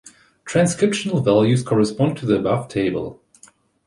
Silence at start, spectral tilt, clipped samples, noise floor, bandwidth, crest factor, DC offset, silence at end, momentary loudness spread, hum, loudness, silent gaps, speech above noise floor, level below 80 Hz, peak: 0.05 s; -6 dB/octave; under 0.1%; -52 dBFS; 11.5 kHz; 16 dB; under 0.1%; 0.75 s; 7 LU; none; -19 LUFS; none; 34 dB; -52 dBFS; -4 dBFS